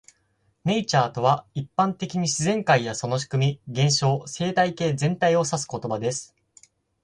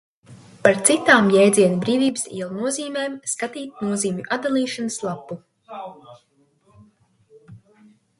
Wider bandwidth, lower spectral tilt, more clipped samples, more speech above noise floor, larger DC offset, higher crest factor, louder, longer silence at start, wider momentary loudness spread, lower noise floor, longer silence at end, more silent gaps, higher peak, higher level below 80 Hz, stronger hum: about the same, 11.5 kHz vs 12 kHz; about the same, -4.5 dB/octave vs -4 dB/octave; neither; first, 45 dB vs 40 dB; neither; about the same, 18 dB vs 22 dB; second, -24 LUFS vs -20 LUFS; first, 0.65 s vs 0.3 s; second, 7 LU vs 22 LU; first, -68 dBFS vs -60 dBFS; first, 0.8 s vs 0.6 s; neither; second, -6 dBFS vs 0 dBFS; first, -60 dBFS vs -66 dBFS; neither